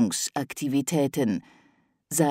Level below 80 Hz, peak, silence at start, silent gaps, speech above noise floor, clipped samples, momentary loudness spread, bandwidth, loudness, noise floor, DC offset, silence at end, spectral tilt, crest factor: -68 dBFS; -8 dBFS; 0 s; none; 38 dB; under 0.1%; 6 LU; 16 kHz; -27 LUFS; -64 dBFS; under 0.1%; 0 s; -4.5 dB/octave; 18 dB